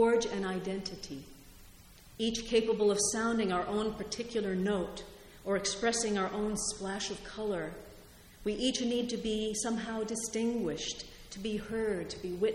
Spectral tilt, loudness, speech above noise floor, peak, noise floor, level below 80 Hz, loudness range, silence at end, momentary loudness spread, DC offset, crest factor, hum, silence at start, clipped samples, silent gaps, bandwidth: -3.5 dB/octave; -33 LUFS; 22 dB; -16 dBFS; -55 dBFS; -56 dBFS; 3 LU; 0 s; 14 LU; under 0.1%; 16 dB; none; 0 s; under 0.1%; none; 16.5 kHz